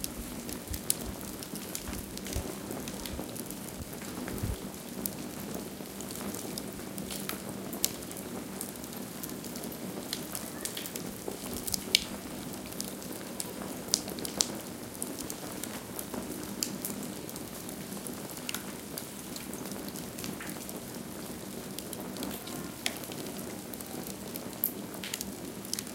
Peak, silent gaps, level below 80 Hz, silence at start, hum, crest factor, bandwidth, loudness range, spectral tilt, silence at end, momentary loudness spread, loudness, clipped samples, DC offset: 0 dBFS; none; -54 dBFS; 0 s; none; 38 dB; 17 kHz; 5 LU; -3 dB/octave; 0 s; 8 LU; -37 LUFS; under 0.1%; under 0.1%